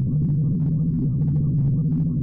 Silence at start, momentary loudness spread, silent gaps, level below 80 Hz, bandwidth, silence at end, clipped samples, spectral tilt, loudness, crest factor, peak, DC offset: 0 s; 1 LU; none; -38 dBFS; 1.3 kHz; 0 s; under 0.1%; -15.5 dB/octave; -22 LUFS; 6 dB; -16 dBFS; under 0.1%